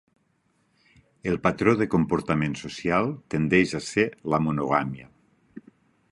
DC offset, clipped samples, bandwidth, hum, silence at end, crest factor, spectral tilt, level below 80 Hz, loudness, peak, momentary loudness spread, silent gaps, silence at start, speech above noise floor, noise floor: under 0.1%; under 0.1%; 11.5 kHz; none; 0.5 s; 22 dB; -6.5 dB/octave; -52 dBFS; -25 LUFS; -4 dBFS; 8 LU; none; 1.25 s; 45 dB; -69 dBFS